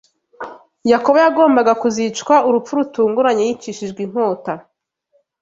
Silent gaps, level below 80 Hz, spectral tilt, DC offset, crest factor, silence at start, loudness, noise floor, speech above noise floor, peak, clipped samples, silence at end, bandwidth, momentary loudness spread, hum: none; -62 dBFS; -4.5 dB/octave; under 0.1%; 16 dB; 0.4 s; -16 LUFS; -63 dBFS; 48 dB; -2 dBFS; under 0.1%; 0.8 s; 7.8 kHz; 17 LU; none